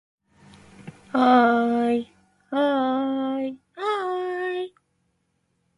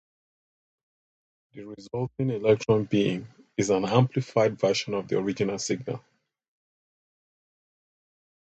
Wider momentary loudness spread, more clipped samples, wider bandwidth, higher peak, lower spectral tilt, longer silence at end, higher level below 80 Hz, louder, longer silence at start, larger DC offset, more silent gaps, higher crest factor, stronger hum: about the same, 14 LU vs 13 LU; neither; first, 10.5 kHz vs 8.8 kHz; about the same, -6 dBFS vs -4 dBFS; about the same, -6 dB/octave vs -6 dB/octave; second, 1.1 s vs 2.55 s; second, -68 dBFS vs -62 dBFS; first, -23 LUFS vs -26 LUFS; second, 0.8 s vs 1.55 s; neither; neither; second, 18 dB vs 24 dB; neither